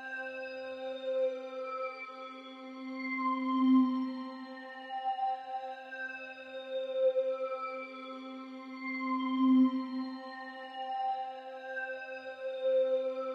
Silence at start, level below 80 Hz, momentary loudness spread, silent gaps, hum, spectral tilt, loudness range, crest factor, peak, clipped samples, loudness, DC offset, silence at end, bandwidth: 0 s; under -90 dBFS; 17 LU; none; none; -5.5 dB/octave; 4 LU; 16 dB; -18 dBFS; under 0.1%; -34 LUFS; under 0.1%; 0 s; 5.8 kHz